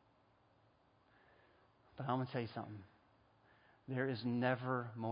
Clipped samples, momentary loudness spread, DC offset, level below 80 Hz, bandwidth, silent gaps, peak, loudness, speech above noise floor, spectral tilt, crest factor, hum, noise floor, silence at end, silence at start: under 0.1%; 18 LU; under 0.1%; -78 dBFS; 5 kHz; none; -22 dBFS; -41 LUFS; 33 dB; -5.5 dB/octave; 22 dB; none; -73 dBFS; 0 s; 1.95 s